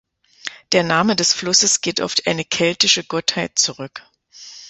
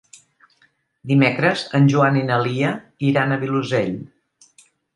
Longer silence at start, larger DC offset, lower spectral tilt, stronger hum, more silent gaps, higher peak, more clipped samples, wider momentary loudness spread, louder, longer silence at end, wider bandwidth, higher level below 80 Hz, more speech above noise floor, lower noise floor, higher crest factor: second, 0.45 s vs 1.05 s; neither; second, -2 dB/octave vs -7 dB/octave; neither; neither; about the same, 0 dBFS vs -2 dBFS; neither; first, 18 LU vs 8 LU; first, -16 LUFS vs -19 LUFS; second, 0 s vs 0.9 s; second, 8.4 kHz vs 10.5 kHz; about the same, -58 dBFS vs -62 dBFS; second, 23 dB vs 43 dB; second, -41 dBFS vs -61 dBFS; about the same, 20 dB vs 18 dB